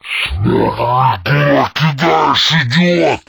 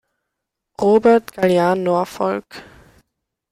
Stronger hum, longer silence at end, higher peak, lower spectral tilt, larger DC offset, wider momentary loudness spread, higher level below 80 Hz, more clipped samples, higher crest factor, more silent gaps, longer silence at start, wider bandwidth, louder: neither; second, 0.1 s vs 0.9 s; first, 0 dBFS vs -4 dBFS; about the same, -5.5 dB/octave vs -6.5 dB/octave; neither; second, 4 LU vs 14 LU; first, -34 dBFS vs -58 dBFS; neither; about the same, 12 dB vs 16 dB; neither; second, 0.05 s vs 0.8 s; first, 19 kHz vs 15.5 kHz; first, -12 LUFS vs -17 LUFS